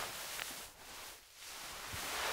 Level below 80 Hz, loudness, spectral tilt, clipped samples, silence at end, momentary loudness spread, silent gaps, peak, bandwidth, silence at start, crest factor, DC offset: -66 dBFS; -44 LUFS; -0.5 dB/octave; under 0.1%; 0 s; 9 LU; none; -18 dBFS; 16 kHz; 0 s; 26 dB; under 0.1%